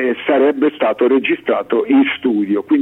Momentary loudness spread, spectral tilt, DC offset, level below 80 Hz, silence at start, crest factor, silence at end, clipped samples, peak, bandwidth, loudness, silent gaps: 4 LU; -7.5 dB/octave; under 0.1%; -62 dBFS; 0 s; 12 dB; 0 s; under 0.1%; -4 dBFS; 4 kHz; -15 LUFS; none